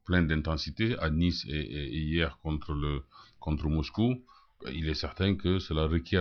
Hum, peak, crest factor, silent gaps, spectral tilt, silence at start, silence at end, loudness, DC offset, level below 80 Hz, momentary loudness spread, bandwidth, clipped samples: none; -12 dBFS; 18 dB; none; -7 dB/octave; 0.05 s; 0 s; -31 LUFS; under 0.1%; -40 dBFS; 8 LU; 6.6 kHz; under 0.1%